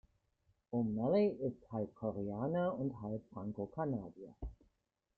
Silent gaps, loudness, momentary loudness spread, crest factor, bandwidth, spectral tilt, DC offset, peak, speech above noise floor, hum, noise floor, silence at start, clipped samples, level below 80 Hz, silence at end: none; -39 LUFS; 18 LU; 18 dB; 4.7 kHz; -10.5 dB/octave; under 0.1%; -22 dBFS; 45 dB; none; -83 dBFS; 0.7 s; under 0.1%; -60 dBFS; 0.65 s